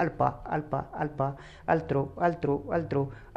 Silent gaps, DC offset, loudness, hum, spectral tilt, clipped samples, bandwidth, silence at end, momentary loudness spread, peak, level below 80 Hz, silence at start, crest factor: none; under 0.1%; -30 LUFS; none; -9 dB/octave; under 0.1%; 7.6 kHz; 0 s; 7 LU; -10 dBFS; -52 dBFS; 0 s; 20 dB